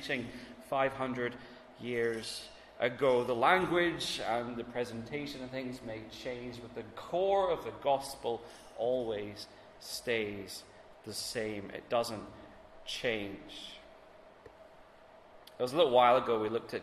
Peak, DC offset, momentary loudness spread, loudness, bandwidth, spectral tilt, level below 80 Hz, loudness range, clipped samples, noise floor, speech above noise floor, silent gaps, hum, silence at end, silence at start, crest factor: -12 dBFS; under 0.1%; 19 LU; -33 LUFS; 13.5 kHz; -4 dB/octave; -64 dBFS; 7 LU; under 0.1%; -57 dBFS; 24 dB; none; none; 0 s; 0 s; 22 dB